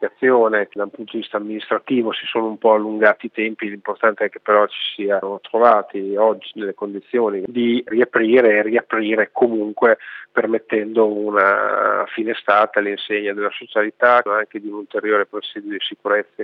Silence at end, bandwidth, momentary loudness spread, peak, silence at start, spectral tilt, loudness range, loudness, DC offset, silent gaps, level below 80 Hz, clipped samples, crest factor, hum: 0 s; 5 kHz; 11 LU; 0 dBFS; 0 s; -7.5 dB/octave; 2 LU; -18 LUFS; under 0.1%; none; -78 dBFS; under 0.1%; 18 dB; none